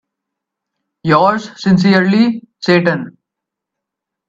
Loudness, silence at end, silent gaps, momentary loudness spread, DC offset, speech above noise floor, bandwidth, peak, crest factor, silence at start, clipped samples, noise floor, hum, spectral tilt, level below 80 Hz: -13 LUFS; 1.2 s; none; 11 LU; under 0.1%; 69 dB; 7.6 kHz; 0 dBFS; 16 dB; 1.05 s; under 0.1%; -81 dBFS; none; -7 dB/octave; -56 dBFS